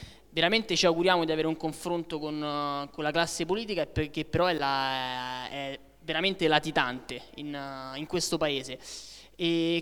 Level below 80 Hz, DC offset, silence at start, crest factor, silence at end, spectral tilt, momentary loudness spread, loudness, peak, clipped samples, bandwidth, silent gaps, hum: -54 dBFS; under 0.1%; 0 s; 24 dB; 0 s; -4 dB/octave; 14 LU; -29 LUFS; -6 dBFS; under 0.1%; 17.5 kHz; none; none